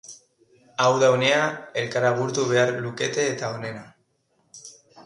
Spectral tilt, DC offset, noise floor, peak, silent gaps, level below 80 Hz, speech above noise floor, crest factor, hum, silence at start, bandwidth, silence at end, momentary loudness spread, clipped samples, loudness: -4 dB/octave; under 0.1%; -68 dBFS; -6 dBFS; none; -68 dBFS; 46 dB; 18 dB; none; 0.05 s; 11 kHz; 0.05 s; 23 LU; under 0.1%; -22 LUFS